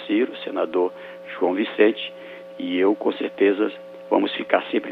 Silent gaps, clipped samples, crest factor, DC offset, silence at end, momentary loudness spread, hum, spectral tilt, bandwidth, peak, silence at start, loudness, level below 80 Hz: none; under 0.1%; 20 dB; under 0.1%; 0 s; 15 LU; none; -7 dB/octave; 5.2 kHz; -2 dBFS; 0 s; -23 LUFS; -78 dBFS